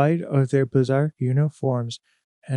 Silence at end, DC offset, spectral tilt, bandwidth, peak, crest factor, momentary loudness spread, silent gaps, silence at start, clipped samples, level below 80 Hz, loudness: 0 s; under 0.1%; -8 dB/octave; 10 kHz; -4 dBFS; 18 dB; 8 LU; 2.24-2.42 s; 0 s; under 0.1%; -66 dBFS; -22 LUFS